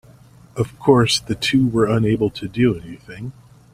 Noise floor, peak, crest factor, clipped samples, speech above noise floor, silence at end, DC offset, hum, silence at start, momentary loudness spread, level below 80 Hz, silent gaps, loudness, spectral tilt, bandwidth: -47 dBFS; 0 dBFS; 18 dB; under 0.1%; 28 dB; 0.4 s; under 0.1%; none; 0.55 s; 18 LU; -46 dBFS; none; -18 LUFS; -5.5 dB/octave; 15.5 kHz